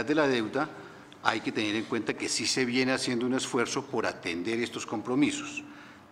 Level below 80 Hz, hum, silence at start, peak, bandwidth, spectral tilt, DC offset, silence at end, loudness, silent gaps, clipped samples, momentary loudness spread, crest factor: -70 dBFS; none; 0 s; -4 dBFS; 15.5 kHz; -3.5 dB/octave; under 0.1%; 0.05 s; -29 LUFS; none; under 0.1%; 10 LU; 26 dB